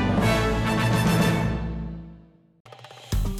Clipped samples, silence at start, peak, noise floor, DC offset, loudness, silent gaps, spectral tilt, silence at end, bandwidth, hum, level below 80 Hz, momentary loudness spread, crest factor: under 0.1%; 0 s; -10 dBFS; -50 dBFS; under 0.1%; -23 LUFS; 2.60-2.65 s; -6 dB/octave; 0 s; 16 kHz; none; -34 dBFS; 18 LU; 14 dB